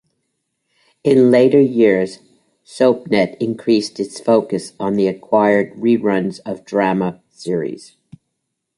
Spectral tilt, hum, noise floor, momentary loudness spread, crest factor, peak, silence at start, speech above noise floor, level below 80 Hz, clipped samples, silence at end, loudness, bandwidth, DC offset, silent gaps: -6.5 dB/octave; none; -75 dBFS; 13 LU; 16 dB; -2 dBFS; 1.05 s; 60 dB; -60 dBFS; under 0.1%; 1 s; -16 LUFS; 11.5 kHz; under 0.1%; none